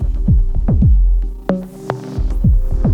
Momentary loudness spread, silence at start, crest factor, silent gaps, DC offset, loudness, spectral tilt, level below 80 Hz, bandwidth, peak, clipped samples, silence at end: 10 LU; 0 s; 12 dB; none; under 0.1%; -17 LUFS; -9.5 dB/octave; -14 dBFS; 4.1 kHz; -2 dBFS; under 0.1%; 0 s